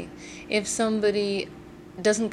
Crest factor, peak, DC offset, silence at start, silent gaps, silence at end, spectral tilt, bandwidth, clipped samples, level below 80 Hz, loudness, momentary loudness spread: 16 dB; -10 dBFS; under 0.1%; 0 s; none; 0 s; -3.5 dB/octave; 13.5 kHz; under 0.1%; -58 dBFS; -26 LUFS; 18 LU